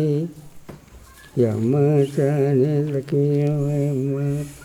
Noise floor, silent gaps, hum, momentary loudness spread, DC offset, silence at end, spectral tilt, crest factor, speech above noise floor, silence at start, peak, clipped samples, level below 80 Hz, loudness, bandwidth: -45 dBFS; none; none; 7 LU; under 0.1%; 0 s; -9 dB/octave; 14 dB; 25 dB; 0 s; -6 dBFS; under 0.1%; -54 dBFS; -21 LUFS; 12.5 kHz